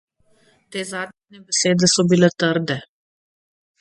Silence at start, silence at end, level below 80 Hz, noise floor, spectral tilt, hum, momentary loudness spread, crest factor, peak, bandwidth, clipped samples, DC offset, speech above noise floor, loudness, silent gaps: 0.7 s; 0.95 s; -62 dBFS; -58 dBFS; -4 dB/octave; none; 15 LU; 20 dB; 0 dBFS; 11.5 kHz; under 0.1%; under 0.1%; 39 dB; -19 LUFS; none